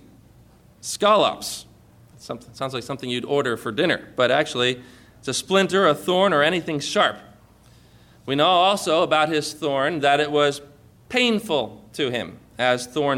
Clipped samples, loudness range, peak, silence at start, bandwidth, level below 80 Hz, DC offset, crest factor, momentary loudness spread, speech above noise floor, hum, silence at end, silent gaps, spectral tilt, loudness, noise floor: under 0.1%; 4 LU; -6 dBFS; 0.85 s; 17 kHz; -60 dBFS; under 0.1%; 16 dB; 15 LU; 31 dB; none; 0 s; none; -3.5 dB/octave; -21 LUFS; -52 dBFS